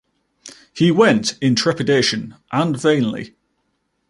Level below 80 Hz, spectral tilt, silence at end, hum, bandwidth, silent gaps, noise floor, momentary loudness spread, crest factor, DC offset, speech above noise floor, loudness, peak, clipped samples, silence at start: -58 dBFS; -5 dB/octave; 0.8 s; none; 11.5 kHz; none; -69 dBFS; 14 LU; 18 dB; under 0.1%; 52 dB; -17 LUFS; -2 dBFS; under 0.1%; 0.45 s